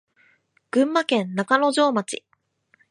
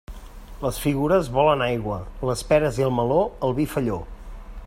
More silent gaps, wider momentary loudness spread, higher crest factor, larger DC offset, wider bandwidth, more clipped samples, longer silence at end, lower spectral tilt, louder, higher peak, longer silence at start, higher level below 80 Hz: neither; second, 9 LU vs 20 LU; about the same, 20 dB vs 18 dB; neither; second, 11.5 kHz vs 16 kHz; neither; first, 0.75 s vs 0 s; second, -4.5 dB/octave vs -6 dB/octave; about the same, -21 LUFS vs -23 LUFS; about the same, -4 dBFS vs -4 dBFS; first, 0.75 s vs 0.1 s; second, -76 dBFS vs -38 dBFS